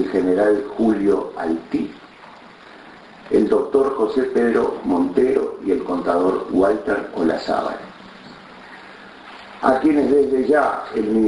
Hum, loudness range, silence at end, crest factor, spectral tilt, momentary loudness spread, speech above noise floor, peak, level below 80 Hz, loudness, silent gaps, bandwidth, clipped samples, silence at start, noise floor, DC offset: none; 4 LU; 0 s; 18 dB; -7 dB/octave; 22 LU; 24 dB; 0 dBFS; -52 dBFS; -19 LUFS; none; 11 kHz; under 0.1%; 0 s; -43 dBFS; under 0.1%